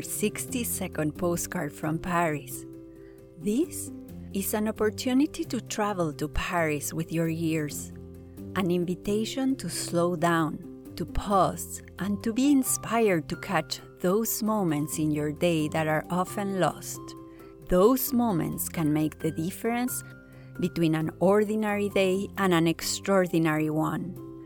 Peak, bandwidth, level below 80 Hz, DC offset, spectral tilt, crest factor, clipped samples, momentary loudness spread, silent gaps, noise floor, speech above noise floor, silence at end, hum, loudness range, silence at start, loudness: -8 dBFS; 19 kHz; -48 dBFS; under 0.1%; -5 dB/octave; 18 dB; under 0.1%; 13 LU; none; -48 dBFS; 21 dB; 0 s; none; 4 LU; 0 s; -27 LUFS